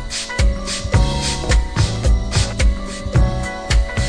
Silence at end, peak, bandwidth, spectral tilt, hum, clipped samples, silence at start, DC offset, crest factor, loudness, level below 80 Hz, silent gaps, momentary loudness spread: 0 s; -2 dBFS; 10.5 kHz; -4.5 dB/octave; none; under 0.1%; 0 s; under 0.1%; 14 dB; -19 LUFS; -20 dBFS; none; 4 LU